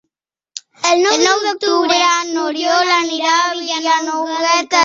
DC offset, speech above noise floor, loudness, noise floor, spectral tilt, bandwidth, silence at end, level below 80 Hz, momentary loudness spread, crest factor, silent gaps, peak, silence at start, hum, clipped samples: under 0.1%; 64 dB; -14 LUFS; -79 dBFS; 0 dB/octave; 7.8 kHz; 0 s; -66 dBFS; 7 LU; 14 dB; none; 0 dBFS; 0.55 s; none; under 0.1%